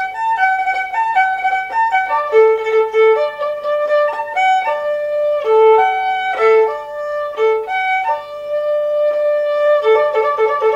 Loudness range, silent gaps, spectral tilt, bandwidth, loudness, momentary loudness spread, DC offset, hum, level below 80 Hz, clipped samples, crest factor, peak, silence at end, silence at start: 2 LU; none; -2 dB/octave; 7.6 kHz; -15 LUFS; 7 LU; under 0.1%; 50 Hz at -60 dBFS; -60 dBFS; under 0.1%; 14 dB; -2 dBFS; 0 s; 0 s